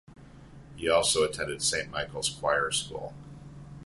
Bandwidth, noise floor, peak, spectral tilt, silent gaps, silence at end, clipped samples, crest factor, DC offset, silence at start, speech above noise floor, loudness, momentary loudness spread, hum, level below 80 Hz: 11.5 kHz; -49 dBFS; -10 dBFS; -2 dB/octave; none; 0 s; under 0.1%; 20 dB; under 0.1%; 0.1 s; 20 dB; -28 LUFS; 22 LU; none; -54 dBFS